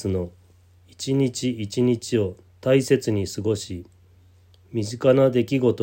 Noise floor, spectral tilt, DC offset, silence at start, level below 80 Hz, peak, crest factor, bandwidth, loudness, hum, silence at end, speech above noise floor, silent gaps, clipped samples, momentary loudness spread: -54 dBFS; -6 dB/octave; under 0.1%; 0 s; -60 dBFS; -4 dBFS; 18 dB; 16.5 kHz; -23 LUFS; none; 0 s; 32 dB; none; under 0.1%; 13 LU